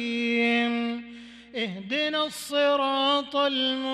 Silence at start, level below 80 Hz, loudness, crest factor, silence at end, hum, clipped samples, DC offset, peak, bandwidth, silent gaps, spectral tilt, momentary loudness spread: 0 s; -68 dBFS; -25 LUFS; 12 dB; 0 s; none; under 0.1%; under 0.1%; -14 dBFS; 14.5 kHz; none; -3.5 dB/octave; 12 LU